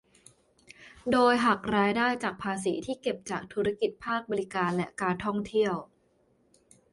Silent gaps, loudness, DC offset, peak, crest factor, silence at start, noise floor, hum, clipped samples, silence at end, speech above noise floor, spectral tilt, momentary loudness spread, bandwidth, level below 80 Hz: none; -29 LUFS; under 0.1%; -10 dBFS; 20 dB; 0.8 s; -68 dBFS; none; under 0.1%; 1.1 s; 40 dB; -5 dB/octave; 9 LU; 11.5 kHz; -62 dBFS